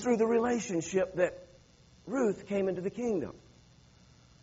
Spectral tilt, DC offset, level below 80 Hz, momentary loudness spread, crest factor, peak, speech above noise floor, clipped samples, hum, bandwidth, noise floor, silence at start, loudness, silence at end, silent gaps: -6 dB/octave; under 0.1%; -64 dBFS; 10 LU; 18 dB; -14 dBFS; 29 dB; under 0.1%; none; 8 kHz; -60 dBFS; 0 s; -31 LUFS; 1.05 s; none